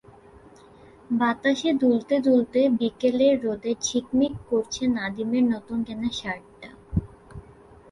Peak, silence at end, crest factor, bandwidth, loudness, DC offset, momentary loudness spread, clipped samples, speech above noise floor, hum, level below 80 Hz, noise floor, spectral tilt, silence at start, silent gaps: -8 dBFS; 0.5 s; 16 dB; 11 kHz; -24 LUFS; under 0.1%; 10 LU; under 0.1%; 27 dB; none; -48 dBFS; -50 dBFS; -5 dB/octave; 1.1 s; none